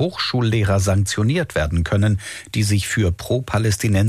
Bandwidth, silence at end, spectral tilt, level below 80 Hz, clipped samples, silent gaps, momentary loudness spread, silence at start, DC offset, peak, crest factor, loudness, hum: 14.5 kHz; 0 s; -5.5 dB/octave; -36 dBFS; under 0.1%; none; 4 LU; 0 s; under 0.1%; -10 dBFS; 10 dB; -20 LUFS; none